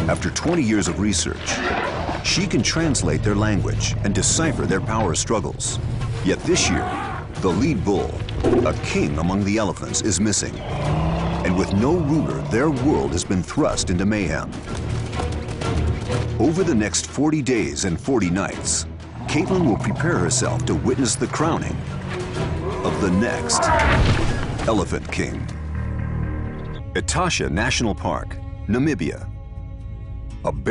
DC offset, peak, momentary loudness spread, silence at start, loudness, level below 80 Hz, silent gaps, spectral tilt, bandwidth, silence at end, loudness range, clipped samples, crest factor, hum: under 0.1%; -6 dBFS; 9 LU; 0 s; -21 LUFS; -32 dBFS; none; -4.5 dB/octave; 11 kHz; 0 s; 3 LU; under 0.1%; 14 dB; none